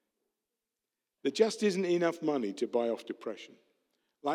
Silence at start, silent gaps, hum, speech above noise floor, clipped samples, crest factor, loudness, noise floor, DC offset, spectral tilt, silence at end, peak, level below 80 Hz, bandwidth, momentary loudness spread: 1.25 s; none; none; 58 dB; under 0.1%; 22 dB; -32 LUFS; -89 dBFS; under 0.1%; -5 dB/octave; 0 s; -12 dBFS; under -90 dBFS; 13.5 kHz; 12 LU